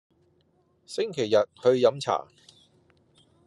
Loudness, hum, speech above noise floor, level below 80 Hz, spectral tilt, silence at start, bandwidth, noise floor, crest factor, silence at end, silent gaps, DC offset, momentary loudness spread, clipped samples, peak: -25 LUFS; none; 42 dB; -76 dBFS; -5 dB/octave; 0.9 s; 11.5 kHz; -67 dBFS; 20 dB; 1.25 s; none; under 0.1%; 10 LU; under 0.1%; -8 dBFS